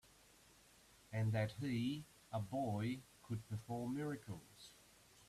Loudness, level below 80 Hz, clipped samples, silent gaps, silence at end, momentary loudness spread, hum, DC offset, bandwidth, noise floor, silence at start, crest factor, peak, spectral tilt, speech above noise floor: -44 LUFS; -72 dBFS; under 0.1%; none; 0.05 s; 19 LU; none; under 0.1%; 14 kHz; -68 dBFS; 1.1 s; 16 dB; -28 dBFS; -7 dB/octave; 25 dB